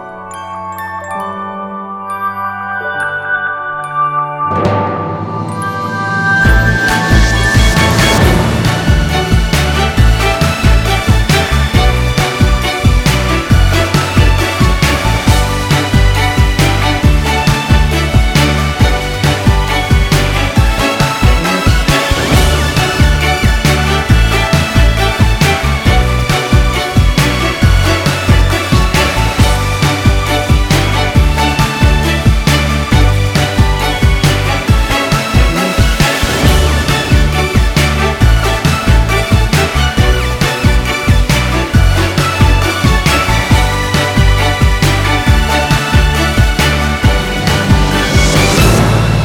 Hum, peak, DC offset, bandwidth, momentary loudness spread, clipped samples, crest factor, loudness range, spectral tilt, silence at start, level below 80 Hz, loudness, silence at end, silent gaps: none; 0 dBFS; under 0.1%; 17.5 kHz; 5 LU; under 0.1%; 10 dB; 1 LU; -5 dB/octave; 0 s; -14 dBFS; -11 LUFS; 0 s; none